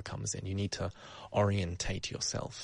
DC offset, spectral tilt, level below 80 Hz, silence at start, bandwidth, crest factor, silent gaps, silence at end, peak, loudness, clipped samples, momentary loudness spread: under 0.1%; -4.5 dB/octave; -52 dBFS; 0 s; 10.5 kHz; 18 dB; none; 0 s; -16 dBFS; -35 LUFS; under 0.1%; 8 LU